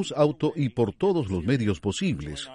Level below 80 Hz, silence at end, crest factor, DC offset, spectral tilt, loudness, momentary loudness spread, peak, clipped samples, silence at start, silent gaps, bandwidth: -50 dBFS; 0 s; 16 dB; under 0.1%; -6.5 dB/octave; -26 LUFS; 4 LU; -10 dBFS; under 0.1%; 0 s; none; 11.5 kHz